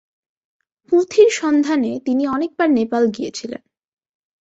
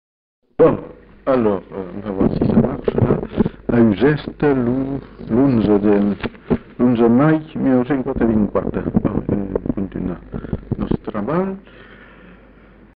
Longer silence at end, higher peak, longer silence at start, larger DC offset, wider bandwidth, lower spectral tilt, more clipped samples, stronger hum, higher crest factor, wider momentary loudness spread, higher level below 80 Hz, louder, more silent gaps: first, 0.85 s vs 0.65 s; about the same, -2 dBFS vs -4 dBFS; first, 0.9 s vs 0.6 s; neither; first, 8 kHz vs 5 kHz; second, -4.5 dB/octave vs -8 dB/octave; neither; neither; about the same, 18 dB vs 14 dB; about the same, 13 LU vs 12 LU; second, -62 dBFS vs -38 dBFS; about the same, -17 LUFS vs -18 LUFS; neither